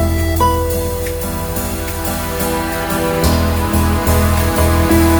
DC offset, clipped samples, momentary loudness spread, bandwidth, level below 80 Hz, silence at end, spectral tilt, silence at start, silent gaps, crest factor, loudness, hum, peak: under 0.1%; under 0.1%; 6 LU; over 20 kHz; -22 dBFS; 0 s; -5.5 dB/octave; 0 s; none; 14 dB; -16 LUFS; none; 0 dBFS